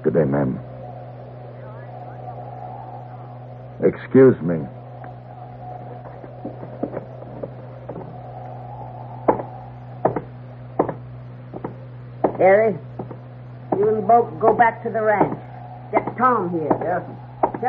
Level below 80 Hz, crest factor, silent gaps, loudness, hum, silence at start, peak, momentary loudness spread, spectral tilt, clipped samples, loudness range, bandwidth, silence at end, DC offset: -54 dBFS; 20 dB; none; -20 LUFS; none; 0 s; -2 dBFS; 21 LU; -8 dB/octave; under 0.1%; 15 LU; 4.5 kHz; 0 s; under 0.1%